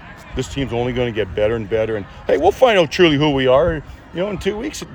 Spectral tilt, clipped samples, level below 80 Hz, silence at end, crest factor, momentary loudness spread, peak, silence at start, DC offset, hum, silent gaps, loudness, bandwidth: -5.5 dB/octave; under 0.1%; -38 dBFS; 0 s; 16 dB; 12 LU; 0 dBFS; 0 s; under 0.1%; none; none; -18 LUFS; over 20 kHz